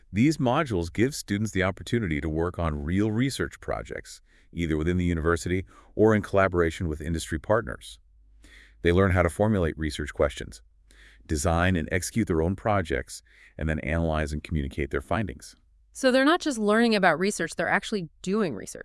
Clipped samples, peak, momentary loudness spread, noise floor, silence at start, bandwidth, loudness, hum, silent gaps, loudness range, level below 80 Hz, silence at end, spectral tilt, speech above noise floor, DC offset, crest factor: under 0.1%; -6 dBFS; 12 LU; -54 dBFS; 0.1 s; 12 kHz; -26 LUFS; none; none; 4 LU; -42 dBFS; 0 s; -5.5 dB/octave; 28 dB; under 0.1%; 20 dB